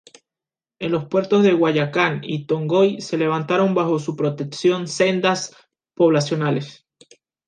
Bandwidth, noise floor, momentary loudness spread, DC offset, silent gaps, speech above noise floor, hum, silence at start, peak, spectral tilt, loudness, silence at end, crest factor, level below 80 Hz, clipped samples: 9.8 kHz; -90 dBFS; 8 LU; under 0.1%; none; 71 dB; none; 0.8 s; -2 dBFS; -6 dB/octave; -20 LUFS; 0.75 s; 18 dB; -66 dBFS; under 0.1%